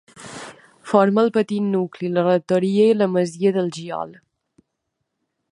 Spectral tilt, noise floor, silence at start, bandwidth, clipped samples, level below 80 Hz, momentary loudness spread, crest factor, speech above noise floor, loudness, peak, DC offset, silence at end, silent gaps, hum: -7 dB/octave; -77 dBFS; 0.15 s; 11 kHz; under 0.1%; -70 dBFS; 19 LU; 20 dB; 58 dB; -19 LUFS; -2 dBFS; under 0.1%; 1.4 s; none; none